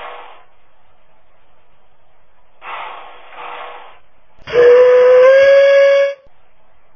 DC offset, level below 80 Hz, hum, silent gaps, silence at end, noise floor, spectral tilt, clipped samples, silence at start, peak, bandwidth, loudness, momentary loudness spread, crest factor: 1%; -56 dBFS; none; none; 0.8 s; -55 dBFS; -3 dB/octave; under 0.1%; 0 s; 0 dBFS; 6.8 kHz; -9 LUFS; 25 LU; 14 dB